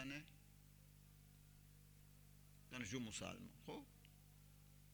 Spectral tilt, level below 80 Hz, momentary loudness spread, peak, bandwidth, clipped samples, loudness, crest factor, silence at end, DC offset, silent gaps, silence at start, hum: -4 dB/octave; -70 dBFS; 18 LU; -34 dBFS; over 20 kHz; under 0.1%; -53 LUFS; 22 dB; 0 s; under 0.1%; none; 0 s; 50 Hz at -70 dBFS